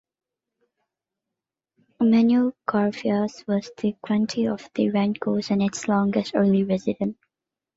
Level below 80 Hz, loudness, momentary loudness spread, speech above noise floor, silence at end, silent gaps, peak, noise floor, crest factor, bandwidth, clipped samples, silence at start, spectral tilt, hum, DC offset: -64 dBFS; -23 LUFS; 8 LU; 65 dB; 0.65 s; none; -6 dBFS; -87 dBFS; 18 dB; 7.8 kHz; under 0.1%; 2 s; -6.5 dB/octave; none; under 0.1%